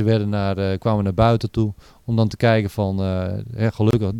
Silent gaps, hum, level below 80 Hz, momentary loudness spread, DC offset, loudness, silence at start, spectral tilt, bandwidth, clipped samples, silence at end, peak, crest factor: none; none; -42 dBFS; 7 LU; under 0.1%; -21 LUFS; 0 s; -8 dB/octave; 11 kHz; under 0.1%; 0 s; -4 dBFS; 16 dB